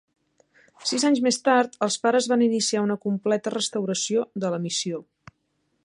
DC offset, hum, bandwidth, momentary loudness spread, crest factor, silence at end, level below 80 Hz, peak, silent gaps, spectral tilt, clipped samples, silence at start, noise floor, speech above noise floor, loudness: under 0.1%; none; 11.5 kHz; 7 LU; 18 dB; 0.85 s; -72 dBFS; -6 dBFS; none; -3.5 dB/octave; under 0.1%; 0.8 s; -72 dBFS; 49 dB; -24 LUFS